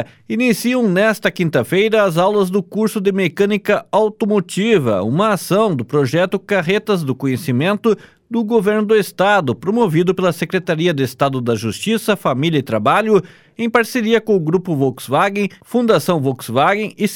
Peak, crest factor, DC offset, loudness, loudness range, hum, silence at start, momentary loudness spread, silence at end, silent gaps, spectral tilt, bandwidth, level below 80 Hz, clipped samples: -2 dBFS; 14 dB; under 0.1%; -16 LUFS; 1 LU; none; 0 s; 5 LU; 0 s; none; -6 dB/octave; 18 kHz; -58 dBFS; under 0.1%